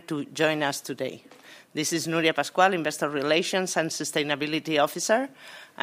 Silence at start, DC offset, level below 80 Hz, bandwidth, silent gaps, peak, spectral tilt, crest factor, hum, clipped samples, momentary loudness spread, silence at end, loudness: 0.1 s; under 0.1%; -76 dBFS; 16 kHz; none; -6 dBFS; -3 dB/octave; 20 dB; none; under 0.1%; 12 LU; 0.2 s; -26 LUFS